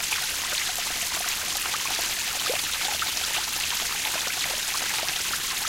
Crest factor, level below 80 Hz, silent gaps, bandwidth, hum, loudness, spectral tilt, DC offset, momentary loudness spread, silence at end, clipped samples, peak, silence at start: 18 dB; -52 dBFS; none; 17 kHz; none; -25 LUFS; 1 dB/octave; under 0.1%; 1 LU; 0 s; under 0.1%; -10 dBFS; 0 s